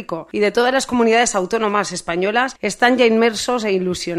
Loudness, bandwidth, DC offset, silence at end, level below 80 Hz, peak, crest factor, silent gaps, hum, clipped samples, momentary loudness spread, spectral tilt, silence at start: -17 LUFS; 14 kHz; under 0.1%; 0 s; -50 dBFS; -2 dBFS; 16 dB; none; none; under 0.1%; 7 LU; -3.5 dB/octave; 0 s